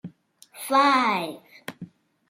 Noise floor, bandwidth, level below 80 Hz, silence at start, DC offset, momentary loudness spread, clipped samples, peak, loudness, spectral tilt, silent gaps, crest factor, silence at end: -53 dBFS; 16.5 kHz; -76 dBFS; 0.05 s; under 0.1%; 22 LU; under 0.1%; -8 dBFS; -21 LUFS; -3.5 dB/octave; none; 18 dB; 0.45 s